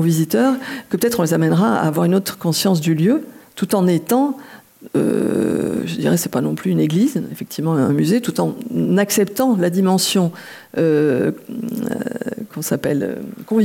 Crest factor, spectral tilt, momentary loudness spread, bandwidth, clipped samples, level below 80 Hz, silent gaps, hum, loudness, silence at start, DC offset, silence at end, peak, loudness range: 14 dB; -5.5 dB/octave; 10 LU; 17 kHz; under 0.1%; -62 dBFS; none; none; -18 LUFS; 0 s; under 0.1%; 0 s; -4 dBFS; 2 LU